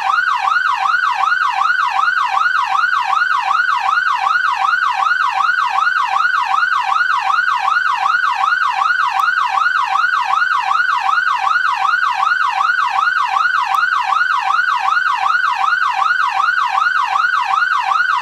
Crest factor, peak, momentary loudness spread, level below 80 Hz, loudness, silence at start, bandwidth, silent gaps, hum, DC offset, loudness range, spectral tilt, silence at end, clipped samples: 12 dB; -2 dBFS; 0 LU; -66 dBFS; -14 LUFS; 0 s; 14 kHz; none; none; under 0.1%; 0 LU; 1 dB/octave; 0 s; under 0.1%